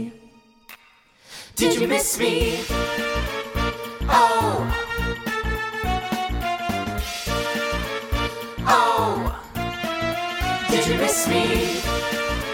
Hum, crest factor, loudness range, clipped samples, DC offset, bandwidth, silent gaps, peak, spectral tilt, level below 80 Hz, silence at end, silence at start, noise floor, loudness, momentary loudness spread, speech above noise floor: none; 20 dB; 4 LU; under 0.1%; under 0.1%; 18 kHz; none; -4 dBFS; -3.5 dB/octave; -34 dBFS; 0 s; 0 s; -55 dBFS; -23 LUFS; 9 LU; 34 dB